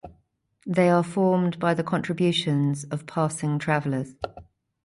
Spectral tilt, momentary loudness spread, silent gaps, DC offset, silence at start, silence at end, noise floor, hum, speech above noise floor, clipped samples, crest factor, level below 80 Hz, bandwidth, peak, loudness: -6 dB/octave; 10 LU; none; under 0.1%; 0.05 s; 0.45 s; -66 dBFS; none; 43 dB; under 0.1%; 16 dB; -60 dBFS; 11.5 kHz; -8 dBFS; -24 LUFS